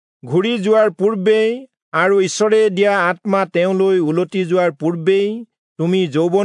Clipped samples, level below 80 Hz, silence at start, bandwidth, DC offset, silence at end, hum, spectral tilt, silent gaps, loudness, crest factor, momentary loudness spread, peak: under 0.1%; -74 dBFS; 0.25 s; 10.5 kHz; under 0.1%; 0 s; none; -5.5 dB/octave; 1.82-1.92 s, 5.58-5.76 s; -16 LUFS; 14 dB; 6 LU; -2 dBFS